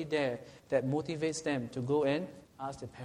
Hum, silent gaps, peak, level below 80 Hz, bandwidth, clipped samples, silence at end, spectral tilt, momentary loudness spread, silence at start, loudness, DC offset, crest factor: none; none; -16 dBFS; -66 dBFS; 11.5 kHz; under 0.1%; 0 s; -5.5 dB/octave; 12 LU; 0 s; -34 LUFS; under 0.1%; 18 dB